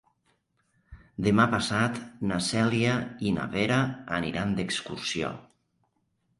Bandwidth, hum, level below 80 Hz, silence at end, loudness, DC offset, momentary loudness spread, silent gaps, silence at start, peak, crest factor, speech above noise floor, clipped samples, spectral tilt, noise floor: 11.5 kHz; none; -54 dBFS; 1 s; -27 LUFS; under 0.1%; 9 LU; none; 0.9 s; -8 dBFS; 22 dB; 47 dB; under 0.1%; -5 dB/octave; -74 dBFS